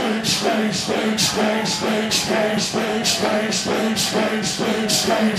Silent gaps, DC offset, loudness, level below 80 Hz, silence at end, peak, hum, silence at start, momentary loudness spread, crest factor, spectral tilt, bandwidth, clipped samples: none; under 0.1%; -19 LUFS; -54 dBFS; 0 s; -6 dBFS; none; 0 s; 3 LU; 14 dB; -3 dB/octave; 15.5 kHz; under 0.1%